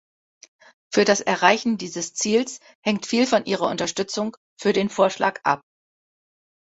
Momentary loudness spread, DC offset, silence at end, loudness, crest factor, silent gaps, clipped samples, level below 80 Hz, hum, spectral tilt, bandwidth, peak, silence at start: 10 LU; under 0.1%; 1.05 s; -22 LUFS; 22 dB; 2.75-2.83 s, 4.37-4.57 s; under 0.1%; -64 dBFS; none; -3.5 dB/octave; 8.2 kHz; -2 dBFS; 0.9 s